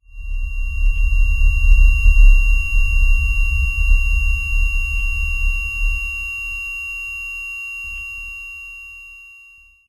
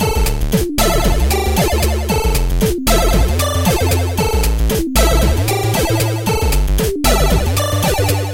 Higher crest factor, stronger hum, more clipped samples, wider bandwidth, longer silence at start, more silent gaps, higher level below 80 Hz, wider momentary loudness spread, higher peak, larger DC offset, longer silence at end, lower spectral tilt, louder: about the same, 16 dB vs 14 dB; neither; neither; second, 10.5 kHz vs 17.5 kHz; first, 0.15 s vs 0 s; neither; about the same, -16 dBFS vs -18 dBFS; first, 15 LU vs 3 LU; about the same, 0 dBFS vs 0 dBFS; neither; first, 0.65 s vs 0 s; second, -2.5 dB/octave vs -4.5 dB/octave; second, -20 LUFS vs -15 LUFS